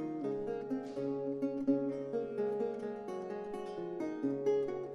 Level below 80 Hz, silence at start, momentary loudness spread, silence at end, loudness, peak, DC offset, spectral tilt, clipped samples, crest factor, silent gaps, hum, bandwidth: -72 dBFS; 0 s; 8 LU; 0 s; -37 LUFS; -20 dBFS; under 0.1%; -8 dB/octave; under 0.1%; 18 dB; none; none; 10.5 kHz